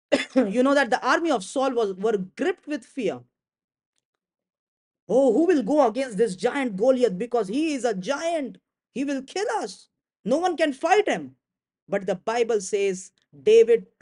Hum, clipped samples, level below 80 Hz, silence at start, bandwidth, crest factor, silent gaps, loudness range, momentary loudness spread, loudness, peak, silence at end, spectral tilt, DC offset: none; under 0.1%; -70 dBFS; 0.1 s; 11 kHz; 18 dB; 3.64-3.68 s, 3.86-3.93 s, 4.05-4.13 s, 4.59-4.91 s, 5.02-5.07 s, 10.19-10.24 s, 11.82-11.87 s; 5 LU; 10 LU; -23 LUFS; -6 dBFS; 0.15 s; -4.5 dB/octave; under 0.1%